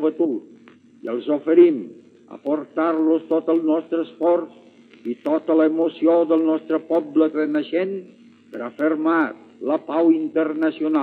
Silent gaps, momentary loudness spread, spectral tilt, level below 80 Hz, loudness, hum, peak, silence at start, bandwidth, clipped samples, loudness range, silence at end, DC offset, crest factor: none; 14 LU; -8 dB/octave; -88 dBFS; -20 LUFS; none; -4 dBFS; 0 s; 4.3 kHz; under 0.1%; 2 LU; 0 s; under 0.1%; 18 dB